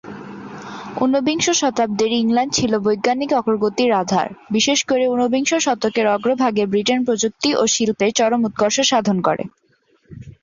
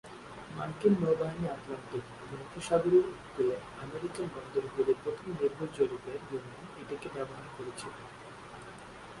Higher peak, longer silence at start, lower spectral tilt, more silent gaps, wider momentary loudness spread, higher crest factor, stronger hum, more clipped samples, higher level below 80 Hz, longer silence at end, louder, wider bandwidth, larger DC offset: first, -4 dBFS vs -14 dBFS; about the same, 0.05 s vs 0.05 s; second, -3.5 dB/octave vs -6.5 dB/octave; neither; second, 6 LU vs 19 LU; about the same, 16 dB vs 20 dB; neither; neither; first, -56 dBFS vs -62 dBFS; about the same, 0.1 s vs 0 s; first, -18 LUFS vs -34 LUFS; second, 7.6 kHz vs 11.5 kHz; neither